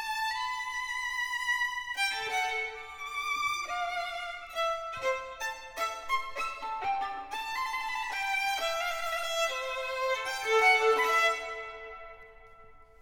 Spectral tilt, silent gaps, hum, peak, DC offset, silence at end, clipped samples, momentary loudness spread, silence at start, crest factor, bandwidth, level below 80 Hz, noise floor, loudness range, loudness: 0.5 dB/octave; none; none; -12 dBFS; under 0.1%; 0.15 s; under 0.1%; 12 LU; 0 s; 20 dB; 19.5 kHz; -60 dBFS; -53 dBFS; 6 LU; -30 LUFS